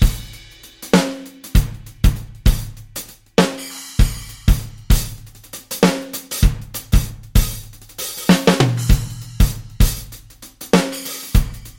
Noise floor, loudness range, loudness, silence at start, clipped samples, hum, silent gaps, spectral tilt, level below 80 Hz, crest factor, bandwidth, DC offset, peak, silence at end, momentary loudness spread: -41 dBFS; 3 LU; -19 LUFS; 0 s; under 0.1%; none; none; -5 dB/octave; -20 dBFS; 16 dB; 17 kHz; under 0.1%; -2 dBFS; 0.1 s; 16 LU